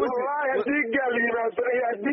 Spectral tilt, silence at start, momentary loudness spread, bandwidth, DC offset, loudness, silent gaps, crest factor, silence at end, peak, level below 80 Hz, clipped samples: -2.5 dB/octave; 0 s; 2 LU; 5.8 kHz; under 0.1%; -25 LUFS; none; 12 dB; 0 s; -12 dBFS; -66 dBFS; under 0.1%